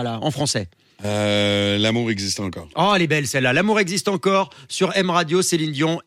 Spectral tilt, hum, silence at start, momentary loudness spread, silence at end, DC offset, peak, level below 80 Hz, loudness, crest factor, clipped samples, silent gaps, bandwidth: -4 dB/octave; none; 0 s; 8 LU; 0.05 s; under 0.1%; -6 dBFS; -60 dBFS; -20 LUFS; 14 dB; under 0.1%; none; 16 kHz